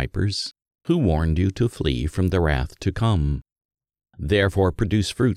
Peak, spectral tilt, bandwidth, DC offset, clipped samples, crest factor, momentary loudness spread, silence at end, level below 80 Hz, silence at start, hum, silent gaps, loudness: -6 dBFS; -6.5 dB/octave; 13 kHz; under 0.1%; under 0.1%; 16 dB; 8 LU; 0 s; -32 dBFS; 0 s; none; 3.52-3.56 s, 3.65-3.69 s; -23 LUFS